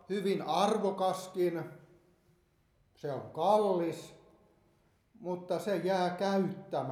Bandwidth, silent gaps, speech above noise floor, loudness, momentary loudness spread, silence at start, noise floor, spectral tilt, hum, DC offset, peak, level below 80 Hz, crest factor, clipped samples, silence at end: 15 kHz; none; 39 dB; -32 LUFS; 14 LU; 0.1 s; -71 dBFS; -6 dB/octave; none; under 0.1%; -14 dBFS; -76 dBFS; 20 dB; under 0.1%; 0 s